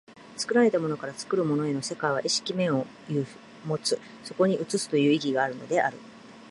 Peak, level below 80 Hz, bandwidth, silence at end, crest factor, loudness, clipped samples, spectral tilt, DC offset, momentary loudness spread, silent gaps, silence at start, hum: -10 dBFS; -72 dBFS; 11.5 kHz; 0 s; 18 dB; -27 LUFS; under 0.1%; -4.5 dB/octave; under 0.1%; 11 LU; none; 0.1 s; none